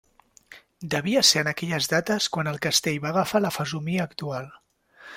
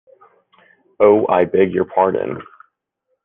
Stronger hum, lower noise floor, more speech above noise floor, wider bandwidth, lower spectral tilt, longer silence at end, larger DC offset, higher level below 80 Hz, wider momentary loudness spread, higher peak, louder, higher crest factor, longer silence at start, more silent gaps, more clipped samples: neither; second, -53 dBFS vs -72 dBFS; second, 28 dB vs 57 dB; first, 16.5 kHz vs 3.7 kHz; second, -3 dB/octave vs -10.5 dB/octave; second, 0 s vs 0.8 s; neither; about the same, -62 dBFS vs -60 dBFS; first, 14 LU vs 11 LU; about the same, -4 dBFS vs -2 dBFS; second, -24 LUFS vs -16 LUFS; first, 22 dB vs 16 dB; second, 0.5 s vs 1 s; neither; neither